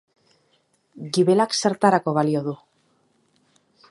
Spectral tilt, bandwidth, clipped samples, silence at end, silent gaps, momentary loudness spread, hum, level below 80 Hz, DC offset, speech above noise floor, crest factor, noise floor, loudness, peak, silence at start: -5 dB/octave; 11.5 kHz; under 0.1%; 1.35 s; none; 15 LU; none; -74 dBFS; under 0.1%; 46 dB; 22 dB; -66 dBFS; -21 LUFS; -2 dBFS; 0.95 s